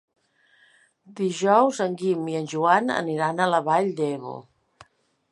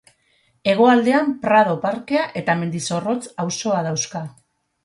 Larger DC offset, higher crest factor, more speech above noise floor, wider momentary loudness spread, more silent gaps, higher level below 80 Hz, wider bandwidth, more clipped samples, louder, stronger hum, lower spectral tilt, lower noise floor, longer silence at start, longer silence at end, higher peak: neither; about the same, 22 dB vs 18 dB; second, 38 dB vs 44 dB; about the same, 10 LU vs 11 LU; neither; second, -76 dBFS vs -64 dBFS; about the same, 11.5 kHz vs 11.5 kHz; neither; second, -23 LUFS vs -19 LUFS; neither; about the same, -5.5 dB/octave vs -5 dB/octave; about the same, -61 dBFS vs -62 dBFS; first, 1.1 s vs 0.65 s; first, 0.9 s vs 0.55 s; about the same, -4 dBFS vs -2 dBFS